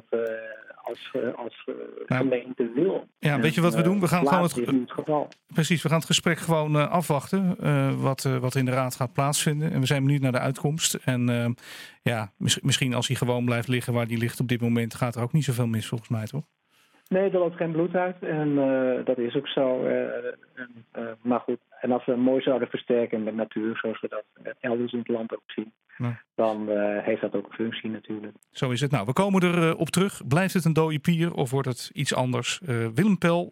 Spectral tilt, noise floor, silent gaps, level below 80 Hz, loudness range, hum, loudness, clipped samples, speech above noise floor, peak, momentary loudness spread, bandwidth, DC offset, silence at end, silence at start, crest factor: -5.5 dB/octave; -63 dBFS; 25.45-25.49 s; -66 dBFS; 5 LU; none; -26 LUFS; under 0.1%; 38 dB; -8 dBFS; 11 LU; 16.5 kHz; under 0.1%; 0 s; 0.1 s; 18 dB